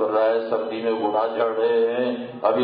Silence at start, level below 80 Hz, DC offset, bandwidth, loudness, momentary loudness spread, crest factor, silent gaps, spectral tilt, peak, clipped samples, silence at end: 0 s; -72 dBFS; under 0.1%; 5 kHz; -22 LUFS; 5 LU; 16 dB; none; -9.5 dB/octave; -6 dBFS; under 0.1%; 0 s